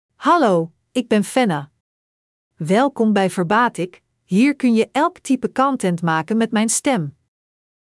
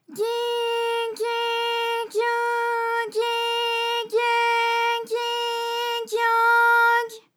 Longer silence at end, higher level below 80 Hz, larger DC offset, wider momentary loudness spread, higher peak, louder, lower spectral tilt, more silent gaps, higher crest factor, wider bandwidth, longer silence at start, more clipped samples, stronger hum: first, 0.85 s vs 0.2 s; first, -66 dBFS vs under -90 dBFS; neither; about the same, 9 LU vs 8 LU; first, -4 dBFS vs -8 dBFS; first, -18 LUFS vs -22 LUFS; first, -5 dB/octave vs 0.5 dB/octave; first, 1.80-2.51 s vs none; about the same, 14 dB vs 14 dB; second, 12 kHz vs 18.5 kHz; about the same, 0.2 s vs 0.1 s; neither; neither